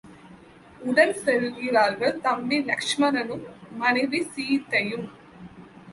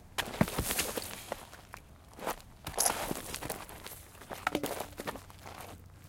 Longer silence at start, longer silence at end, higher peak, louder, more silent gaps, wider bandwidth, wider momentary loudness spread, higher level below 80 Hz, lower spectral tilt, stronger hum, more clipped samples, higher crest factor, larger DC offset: about the same, 0.05 s vs 0 s; about the same, 0 s vs 0 s; first, -6 dBFS vs -10 dBFS; first, -24 LUFS vs -36 LUFS; neither; second, 11.5 kHz vs 17 kHz; second, 13 LU vs 18 LU; second, -66 dBFS vs -52 dBFS; about the same, -4 dB/octave vs -3 dB/octave; neither; neither; second, 20 dB vs 28 dB; neither